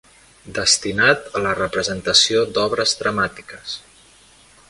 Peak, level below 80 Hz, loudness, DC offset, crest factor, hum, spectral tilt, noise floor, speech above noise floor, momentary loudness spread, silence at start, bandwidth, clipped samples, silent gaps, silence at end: 0 dBFS; -50 dBFS; -17 LUFS; under 0.1%; 20 dB; none; -2 dB/octave; -50 dBFS; 30 dB; 16 LU; 0.45 s; 11.5 kHz; under 0.1%; none; 0.9 s